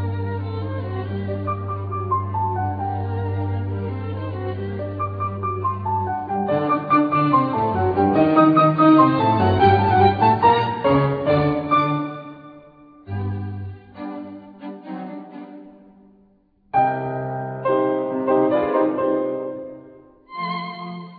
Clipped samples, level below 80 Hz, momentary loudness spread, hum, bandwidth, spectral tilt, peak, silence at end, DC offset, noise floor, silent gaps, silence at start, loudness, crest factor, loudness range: under 0.1%; -50 dBFS; 18 LU; none; 5 kHz; -10.5 dB/octave; -2 dBFS; 0 s; under 0.1%; -58 dBFS; none; 0 s; -20 LUFS; 18 dB; 16 LU